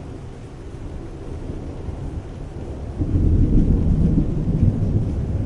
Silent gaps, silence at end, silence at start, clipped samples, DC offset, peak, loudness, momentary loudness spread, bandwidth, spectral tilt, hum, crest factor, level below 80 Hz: none; 0 s; 0 s; under 0.1%; under 0.1%; -4 dBFS; -22 LUFS; 17 LU; 7.4 kHz; -10 dB/octave; none; 16 dB; -26 dBFS